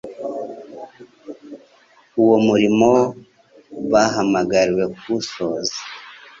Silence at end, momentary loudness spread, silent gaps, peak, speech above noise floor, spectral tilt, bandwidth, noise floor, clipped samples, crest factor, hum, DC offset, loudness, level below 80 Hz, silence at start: 0.25 s; 23 LU; none; -2 dBFS; 37 dB; -5 dB/octave; 7.6 kHz; -53 dBFS; under 0.1%; 18 dB; none; under 0.1%; -18 LUFS; -56 dBFS; 0.05 s